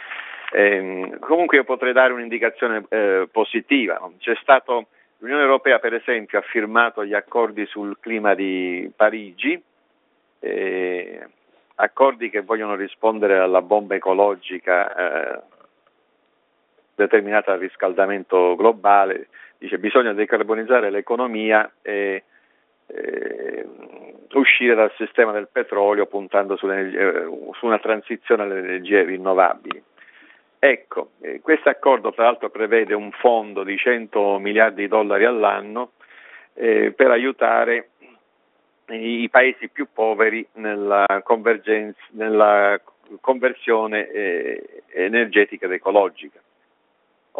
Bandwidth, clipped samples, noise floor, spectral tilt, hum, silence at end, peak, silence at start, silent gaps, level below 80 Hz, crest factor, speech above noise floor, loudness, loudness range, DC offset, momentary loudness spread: 4 kHz; under 0.1%; -65 dBFS; -1.5 dB/octave; none; 1.1 s; 0 dBFS; 0 s; none; -74 dBFS; 20 dB; 45 dB; -19 LUFS; 4 LU; under 0.1%; 13 LU